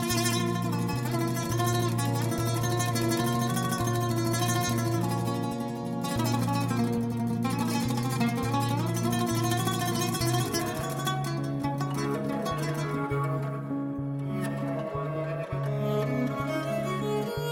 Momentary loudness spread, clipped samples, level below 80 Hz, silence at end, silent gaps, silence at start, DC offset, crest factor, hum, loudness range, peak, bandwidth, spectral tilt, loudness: 5 LU; under 0.1%; -54 dBFS; 0 s; none; 0 s; under 0.1%; 16 dB; none; 3 LU; -12 dBFS; 17 kHz; -5.5 dB/octave; -29 LUFS